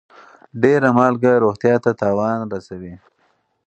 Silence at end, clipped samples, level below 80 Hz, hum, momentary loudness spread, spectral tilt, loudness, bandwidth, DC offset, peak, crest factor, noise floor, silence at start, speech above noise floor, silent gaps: 0.7 s; under 0.1%; -56 dBFS; none; 20 LU; -8 dB/octave; -17 LUFS; 8.4 kHz; under 0.1%; 0 dBFS; 18 dB; -64 dBFS; 0.55 s; 47 dB; none